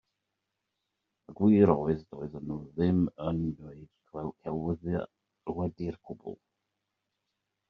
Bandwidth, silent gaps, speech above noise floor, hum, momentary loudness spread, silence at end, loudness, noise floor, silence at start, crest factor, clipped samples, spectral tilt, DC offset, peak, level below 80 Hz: 5.2 kHz; none; 55 dB; none; 21 LU; 1.35 s; -30 LUFS; -84 dBFS; 1.3 s; 24 dB; under 0.1%; -9.5 dB/octave; under 0.1%; -8 dBFS; -58 dBFS